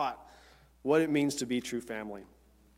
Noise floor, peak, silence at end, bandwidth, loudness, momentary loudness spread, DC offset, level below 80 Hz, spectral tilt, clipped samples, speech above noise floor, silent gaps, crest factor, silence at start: -59 dBFS; -14 dBFS; 0.5 s; 16 kHz; -32 LUFS; 18 LU; under 0.1%; -64 dBFS; -4.5 dB/octave; under 0.1%; 28 dB; none; 20 dB; 0 s